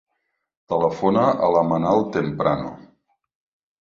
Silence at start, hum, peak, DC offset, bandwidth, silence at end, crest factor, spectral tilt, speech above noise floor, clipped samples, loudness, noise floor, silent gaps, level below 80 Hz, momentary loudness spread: 0.7 s; none; -4 dBFS; under 0.1%; 7.2 kHz; 1 s; 18 dB; -8 dB/octave; 56 dB; under 0.1%; -20 LUFS; -75 dBFS; none; -54 dBFS; 8 LU